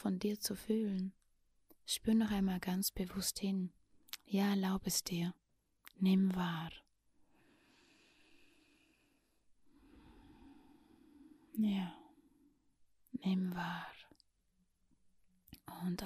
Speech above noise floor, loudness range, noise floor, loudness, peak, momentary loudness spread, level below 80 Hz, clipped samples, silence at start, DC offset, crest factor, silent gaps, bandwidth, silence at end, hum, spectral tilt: 42 dB; 8 LU; -78 dBFS; -38 LUFS; -22 dBFS; 17 LU; -64 dBFS; under 0.1%; 0 s; under 0.1%; 18 dB; none; 15.5 kHz; 0 s; none; -5 dB/octave